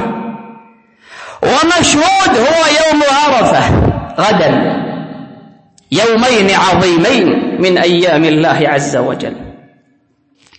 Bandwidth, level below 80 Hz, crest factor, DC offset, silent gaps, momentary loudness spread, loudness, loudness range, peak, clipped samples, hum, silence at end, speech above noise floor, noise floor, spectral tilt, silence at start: 8.8 kHz; -34 dBFS; 12 dB; under 0.1%; none; 14 LU; -10 LUFS; 3 LU; 0 dBFS; under 0.1%; none; 1.05 s; 45 dB; -55 dBFS; -4.5 dB/octave; 0 s